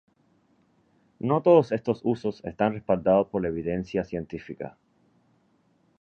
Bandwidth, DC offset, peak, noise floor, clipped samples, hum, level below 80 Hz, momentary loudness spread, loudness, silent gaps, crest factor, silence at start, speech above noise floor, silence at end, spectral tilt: 6.8 kHz; under 0.1%; -6 dBFS; -66 dBFS; under 0.1%; none; -56 dBFS; 17 LU; -25 LUFS; none; 22 dB; 1.25 s; 41 dB; 1.3 s; -9 dB/octave